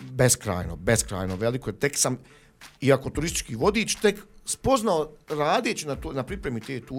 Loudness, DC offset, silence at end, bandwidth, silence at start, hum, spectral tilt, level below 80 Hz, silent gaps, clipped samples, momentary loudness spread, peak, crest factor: -25 LUFS; under 0.1%; 0 s; 16.5 kHz; 0 s; none; -4 dB/octave; -44 dBFS; none; under 0.1%; 9 LU; -6 dBFS; 20 dB